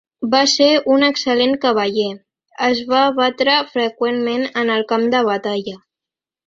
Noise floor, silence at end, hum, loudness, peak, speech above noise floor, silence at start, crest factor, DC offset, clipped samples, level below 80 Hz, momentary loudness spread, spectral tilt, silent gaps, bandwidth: -88 dBFS; 0.7 s; none; -16 LUFS; 0 dBFS; 71 dB; 0.2 s; 16 dB; under 0.1%; under 0.1%; -62 dBFS; 8 LU; -3 dB/octave; none; 7.8 kHz